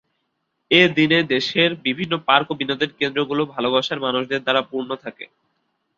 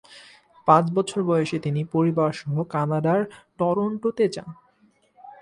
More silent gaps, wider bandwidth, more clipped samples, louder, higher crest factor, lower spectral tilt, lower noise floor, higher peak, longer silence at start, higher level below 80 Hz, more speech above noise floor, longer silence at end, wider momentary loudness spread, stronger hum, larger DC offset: neither; second, 7.4 kHz vs 11 kHz; neither; first, -19 LUFS vs -23 LUFS; about the same, 20 dB vs 20 dB; second, -5.5 dB/octave vs -7.5 dB/octave; first, -73 dBFS vs -62 dBFS; about the same, -2 dBFS vs -4 dBFS; first, 0.7 s vs 0.1 s; about the same, -62 dBFS vs -64 dBFS; first, 53 dB vs 39 dB; first, 0.7 s vs 0.1 s; first, 13 LU vs 9 LU; neither; neither